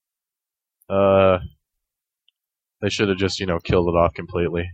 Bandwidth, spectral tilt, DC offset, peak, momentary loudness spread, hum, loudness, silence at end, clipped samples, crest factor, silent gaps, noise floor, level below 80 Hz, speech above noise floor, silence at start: 9 kHz; -6 dB/octave; under 0.1%; -2 dBFS; 10 LU; none; -20 LUFS; 0 s; under 0.1%; 20 dB; none; -88 dBFS; -42 dBFS; 69 dB; 0.9 s